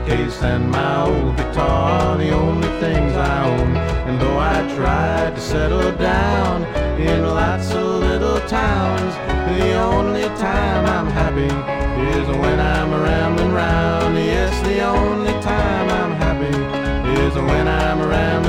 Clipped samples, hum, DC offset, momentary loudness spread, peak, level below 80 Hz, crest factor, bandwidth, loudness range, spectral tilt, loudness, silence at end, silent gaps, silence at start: under 0.1%; none; under 0.1%; 3 LU; -4 dBFS; -24 dBFS; 14 dB; 12 kHz; 1 LU; -6.5 dB/octave; -18 LUFS; 0 s; none; 0 s